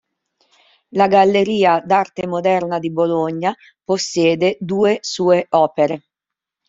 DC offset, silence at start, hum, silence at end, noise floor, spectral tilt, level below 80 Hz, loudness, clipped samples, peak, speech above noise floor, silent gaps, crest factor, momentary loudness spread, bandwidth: under 0.1%; 0.95 s; none; 0.7 s; -85 dBFS; -5 dB/octave; -60 dBFS; -17 LUFS; under 0.1%; -2 dBFS; 69 dB; none; 16 dB; 9 LU; 7.8 kHz